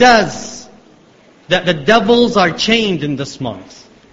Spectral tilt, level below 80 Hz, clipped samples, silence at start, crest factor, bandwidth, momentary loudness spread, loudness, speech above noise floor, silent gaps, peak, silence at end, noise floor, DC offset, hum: -4 dB/octave; -46 dBFS; under 0.1%; 0 s; 14 dB; 8 kHz; 17 LU; -13 LUFS; 33 dB; none; 0 dBFS; 0.5 s; -46 dBFS; under 0.1%; none